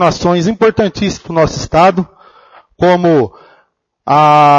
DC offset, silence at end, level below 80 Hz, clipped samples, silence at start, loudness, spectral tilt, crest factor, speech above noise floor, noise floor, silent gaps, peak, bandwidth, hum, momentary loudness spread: under 0.1%; 0 s; -38 dBFS; under 0.1%; 0 s; -12 LUFS; -6 dB/octave; 12 dB; 46 dB; -56 dBFS; none; 0 dBFS; 9 kHz; none; 11 LU